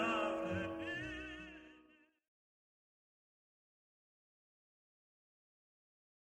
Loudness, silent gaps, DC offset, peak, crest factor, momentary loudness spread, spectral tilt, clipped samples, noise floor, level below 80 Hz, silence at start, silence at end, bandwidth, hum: -42 LUFS; none; under 0.1%; -26 dBFS; 20 dB; 18 LU; -5.5 dB/octave; under 0.1%; -69 dBFS; -68 dBFS; 0 s; 4.45 s; 11 kHz; none